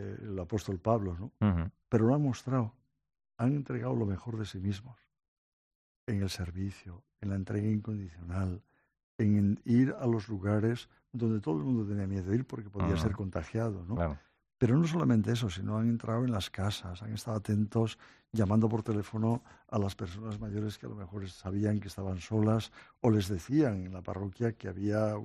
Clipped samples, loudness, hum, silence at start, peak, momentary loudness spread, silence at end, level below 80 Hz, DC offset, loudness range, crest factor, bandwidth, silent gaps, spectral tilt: under 0.1%; -33 LUFS; none; 0 s; -14 dBFS; 12 LU; 0 s; -58 dBFS; under 0.1%; 6 LU; 20 dB; 13.5 kHz; 5.28-6.07 s, 9.03-9.19 s; -7.5 dB/octave